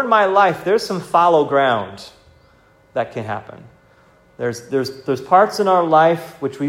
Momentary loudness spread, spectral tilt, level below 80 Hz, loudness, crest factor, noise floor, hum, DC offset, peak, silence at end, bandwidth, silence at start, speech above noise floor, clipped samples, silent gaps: 14 LU; -5.5 dB/octave; -60 dBFS; -17 LUFS; 16 dB; -52 dBFS; none; under 0.1%; 0 dBFS; 0 s; 16 kHz; 0 s; 35 dB; under 0.1%; none